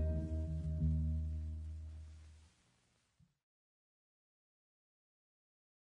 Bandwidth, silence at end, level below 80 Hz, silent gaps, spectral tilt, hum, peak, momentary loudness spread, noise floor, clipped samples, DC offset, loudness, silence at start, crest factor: 3.5 kHz; 3.5 s; -48 dBFS; none; -10 dB/octave; none; -28 dBFS; 17 LU; -77 dBFS; under 0.1%; under 0.1%; -41 LUFS; 0 s; 16 dB